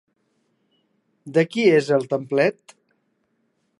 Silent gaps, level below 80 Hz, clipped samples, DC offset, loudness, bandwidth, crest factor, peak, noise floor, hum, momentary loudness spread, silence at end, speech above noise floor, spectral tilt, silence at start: none; -76 dBFS; under 0.1%; under 0.1%; -20 LUFS; 11.5 kHz; 18 dB; -4 dBFS; -70 dBFS; none; 6 LU; 1.25 s; 50 dB; -6.5 dB/octave; 1.25 s